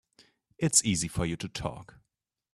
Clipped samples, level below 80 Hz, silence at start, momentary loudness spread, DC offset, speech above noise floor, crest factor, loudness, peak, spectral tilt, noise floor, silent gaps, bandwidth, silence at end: under 0.1%; -52 dBFS; 0.6 s; 14 LU; under 0.1%; 55 dB; 24 dB; -28 LUFS; -8 dBFS; -3.5 dB/octave; -85 dBFS; none; 14 kHz; 0.7 s